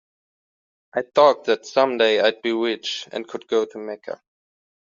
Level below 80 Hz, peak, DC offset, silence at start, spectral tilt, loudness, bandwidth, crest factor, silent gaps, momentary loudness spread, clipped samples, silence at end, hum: -72 dBFS; -2 dBFS; under 0.1%; 0.95 s; -1 dB/octave; -21 LUFS; 7.6 kHz; 20 dB; none; 16 LU; under 0.1%; 0.75 s; none